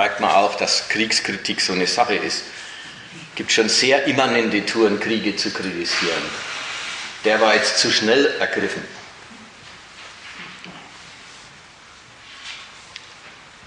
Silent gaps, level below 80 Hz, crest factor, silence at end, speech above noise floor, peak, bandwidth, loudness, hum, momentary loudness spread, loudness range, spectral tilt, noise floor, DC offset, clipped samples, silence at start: none; -62 dBFS; 20 dB; 0 s; 26 dB; -2 dBFS; 10.5 kHz; -19 LUFS; none; 24 LU; 19 LU; -2.5 dB/octave; -45 dBFS; under 0.1%; under 0.1%; 0 s